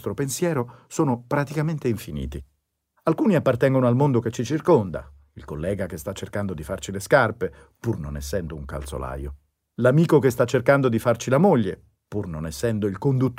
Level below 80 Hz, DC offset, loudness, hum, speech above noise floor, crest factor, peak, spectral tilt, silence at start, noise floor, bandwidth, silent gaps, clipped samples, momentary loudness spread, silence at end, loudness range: -44 dBFS; under 0.1%; -23 LUFS; none; 48 dB; 20 dB; -4 dBFS; -6.5 dB/octave; 0 s; -70 dBFS; 16 kHz; none; under 0.1%; 14 LU; 0 s; 5 LU